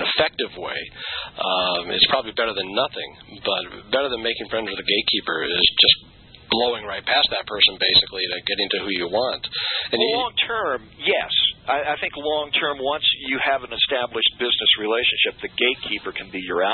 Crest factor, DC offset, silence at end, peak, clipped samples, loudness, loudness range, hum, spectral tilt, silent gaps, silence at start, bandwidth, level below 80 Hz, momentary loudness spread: 20 dB; under 0.1%; 0 s; -2 dBFS; under 0.1%; -20 LUFS; 4 LU; none; -7.5 dB/octave; none; 0 s; 4.5 kHz; -52 dBFS; 10 LU